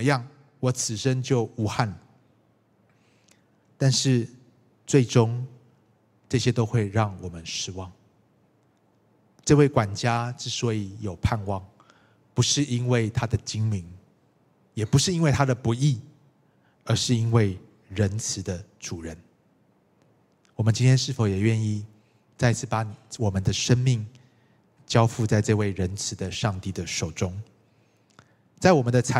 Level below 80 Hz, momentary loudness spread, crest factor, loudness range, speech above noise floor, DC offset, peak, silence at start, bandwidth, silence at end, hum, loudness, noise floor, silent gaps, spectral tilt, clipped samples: -52 dBFS; 14 LU; 22 dB; 4 LU; 40 dB; under 0.1%; -2 dBFS; 0 s; 12.5 kHz; 0 s; none; -25 LUFS; -64 dBFS; none; -5.5 dB/octave; under 0.1%